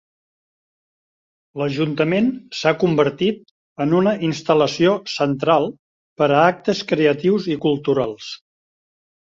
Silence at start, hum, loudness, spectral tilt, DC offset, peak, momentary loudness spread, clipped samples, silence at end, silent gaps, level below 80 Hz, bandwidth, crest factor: 1.55 s; none; -19 LUFS; -6 dB/octave; under 0.1%; -2 dBFS; 10 LU; under 0.1%; 1 s; 3.51-3.76 s, 5.79-6.16 s; -60 dBFS; 7.8 kHz; 18 dB